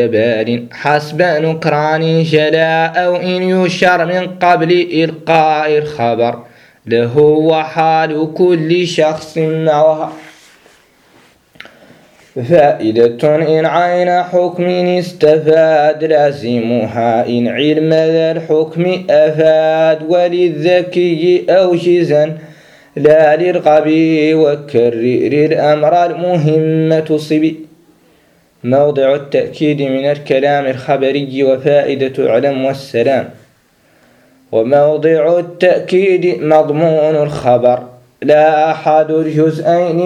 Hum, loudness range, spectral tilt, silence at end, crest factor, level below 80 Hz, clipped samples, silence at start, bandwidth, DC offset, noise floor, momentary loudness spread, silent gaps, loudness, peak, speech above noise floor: none; 4 LU; -7 dB/octave; 0 s; 12 dB; -56 dBFS; under 0.1%; 0 s; 11.5 kHz; under 0.1%; -51 dBFS; 6 LU; none; -12 LUFS; 0 dBFS; 40 dB